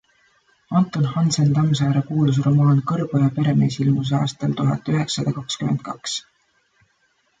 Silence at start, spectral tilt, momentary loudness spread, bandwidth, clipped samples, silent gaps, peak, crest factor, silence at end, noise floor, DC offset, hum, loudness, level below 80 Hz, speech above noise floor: 0.7 s; -6.5 dB/octave; 7 LU; 9.2 kHz; under 0.1%; none; -6 dBFS; 14 dB; 1.2 s; -65 dBFS; under 0.1%; none; -20 LUFS; -58 dBFS; 46 dB